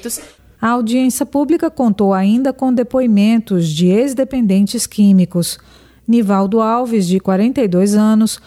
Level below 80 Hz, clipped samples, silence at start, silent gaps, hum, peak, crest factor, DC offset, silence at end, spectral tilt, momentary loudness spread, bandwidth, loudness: -50 dBFS; under 0.1%; 0.05 s; none; none; -4 dBFS; 10 dB; under 0.1%; 0.1 s; -6 dB/octave; 5 LU; 15 kHz; -14 LUFS